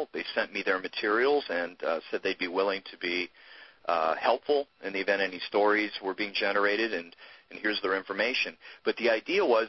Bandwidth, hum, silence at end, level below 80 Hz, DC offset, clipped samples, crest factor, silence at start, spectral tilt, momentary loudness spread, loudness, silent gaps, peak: 6.2 kHz; none; 0 s; -72 dBFS; under 0.1%; under 0.1%; 18 dB; 0 s; -4.5 dB/octave; 8 LU; -29 LUFS; none; -10 dBFS